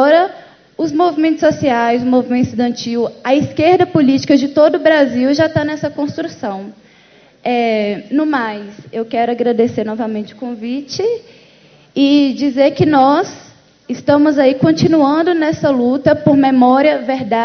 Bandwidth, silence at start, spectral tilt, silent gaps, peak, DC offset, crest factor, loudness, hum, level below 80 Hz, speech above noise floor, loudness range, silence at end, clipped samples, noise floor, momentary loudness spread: 6.6 kHz; 0 s; -6.5 dB/octave; none; 0 dBFS; under 0.1%; 14 dB; -14 LUFS; none; -50 dBFS; 33 dB; 6 LU; 0 s; under 0.1%; -47 dBFS; 12 LU